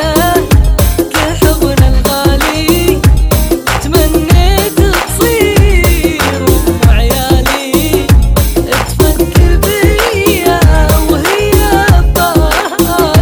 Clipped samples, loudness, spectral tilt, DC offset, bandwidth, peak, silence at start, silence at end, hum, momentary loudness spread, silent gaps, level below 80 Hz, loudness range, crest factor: 1%; -9 LUFS; -5 dB/octave; under 0.1%; over 20 kHz; 0 dBFS; 0 s; 0 s; none; 3 LU; none; -12 dBFS; 1 LU; 8 dB